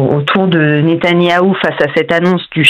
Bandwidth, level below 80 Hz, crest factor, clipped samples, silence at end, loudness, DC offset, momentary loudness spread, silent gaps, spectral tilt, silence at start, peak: 9.4 kHz; -52 dBFS; 10 dB; 0.2%; 0 s; -11 LUFS; under 0.1%; 3 LU; none; -6.5 dB/octave; 0 s; 0 dBFS